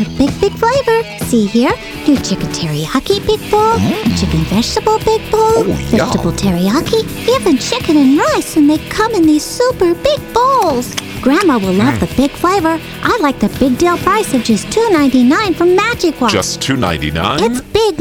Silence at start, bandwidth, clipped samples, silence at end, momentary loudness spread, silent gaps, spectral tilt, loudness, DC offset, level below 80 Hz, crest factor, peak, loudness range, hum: 0 s; 19 kHz; under 0.1%; 0 s; 5 LU; none; -5 dB/octave; -13 LUFS; under 0.1%; -32 dBFS; 12 dB; -2 dBFS; 2 LU; none